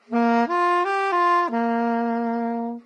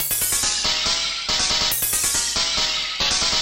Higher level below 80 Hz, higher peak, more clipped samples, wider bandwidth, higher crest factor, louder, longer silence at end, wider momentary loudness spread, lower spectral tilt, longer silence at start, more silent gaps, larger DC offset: second, -86 dBFS vs -42 dBFS; about the same, -8 dBFS vs -8 dBFS; neither; second, 9 kHz vs 17 kHz; about the same, 14 dB vs 14 dB; second, -22 LUFS vs -19 LUFS; about the same, 0.05 s vs 0 s; about the same, 5 LU vs 3 LU; first, -5.5 dB/octave vs 0.5 dB/octave; about the same, 0.1 s vs 0 s; neither; neither